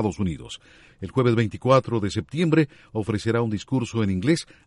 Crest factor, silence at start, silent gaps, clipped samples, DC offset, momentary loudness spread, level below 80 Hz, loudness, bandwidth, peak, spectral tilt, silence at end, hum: 20 dB; 0 s; none; under 0.1%; under 0.1%; 11 LU; -52 dBFS; -24 LUFS; 11.5 kHz; -4 dBFS; -7 dB/octave; 0.25 s; none